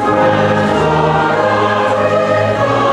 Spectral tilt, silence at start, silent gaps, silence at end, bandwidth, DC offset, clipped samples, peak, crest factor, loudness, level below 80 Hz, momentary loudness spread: -6.5 dB/octave; 0 s; none; 0 s; 11.5 kHz; under 0.1%; under 0.1%; -2 dBFS; 10 dB; -12 LUFS; -42 dBFS; 1 LU